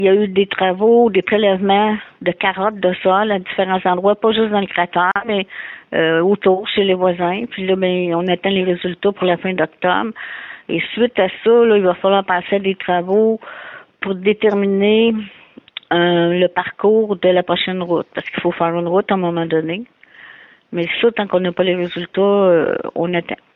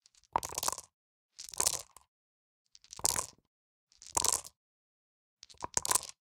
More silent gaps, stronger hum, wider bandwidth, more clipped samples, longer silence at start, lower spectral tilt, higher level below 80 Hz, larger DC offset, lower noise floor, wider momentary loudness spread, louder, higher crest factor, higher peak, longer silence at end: second, none vs 0.94-1.29 s, 2.08-2.65 s, 3.47-3.87 s, 4.57-5.37 s; neither; second, 4.1 kHz vs 18 kHz; neither; second, 0 s vs 0.35 s; first, -9 dB/octave vs 0 dB/octave; first, -58 dBFS vs -64 dBFS; neither; second, -42 dBFS vs under -90 dBFS; second, 9 LU vs 20 LU; first, -16 LUFS vs -33 LUFS; second, 14 dB vs 36 dB; about the same, -4 dBFS vs -4 dBFS; about the same, 0.2 s vs 0.1 s